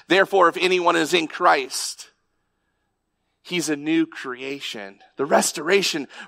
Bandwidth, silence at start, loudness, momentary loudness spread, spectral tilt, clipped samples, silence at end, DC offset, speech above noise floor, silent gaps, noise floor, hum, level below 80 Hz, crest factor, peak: 16 kHz; 0.1 s; -21 LUFS; 13 LU; -3 dB/octave; under 0.1%; 0 s; under 0.1%; 52 dB; none; -74 dBFS; none; -76 dBFS; 18 dB; -4 dBFS